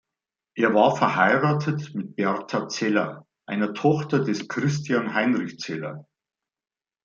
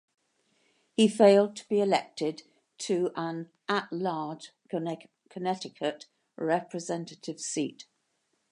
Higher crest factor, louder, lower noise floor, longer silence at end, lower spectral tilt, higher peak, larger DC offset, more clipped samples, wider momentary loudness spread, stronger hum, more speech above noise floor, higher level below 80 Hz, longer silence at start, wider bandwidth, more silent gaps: about the same, 20 dB vs 22 dB; first, -24 LUFS vs -29 LUFS; first, under -90 dBFS vs -76 dBFS; first, 1.05 s vs 0.7 s; about the same, -6 dB/octave vs -5 dB/octave; first, -4 dBFS vs -8 dBFS; neither; neither; second, 13 LU vs 17 LU; neither; first, over 67 dB vs 48 dB; first, -68 dBFS vs -84 dBFS; second, 0.55 s vs 1 s; second, 7.4 kHz vs 11.5 kHz; neither